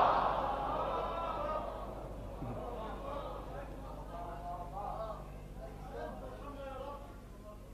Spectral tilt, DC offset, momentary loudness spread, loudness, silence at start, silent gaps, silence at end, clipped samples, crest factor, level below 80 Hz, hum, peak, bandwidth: -6.5 dB/octave; under 0.1%; 13 LU; -41 LUFS; 0 s; none; 0 s; under 0.1%; 24 dB; -50 dBFS; 50 Hz at -50 dBFS; -16 dBFS; 14.5 kHz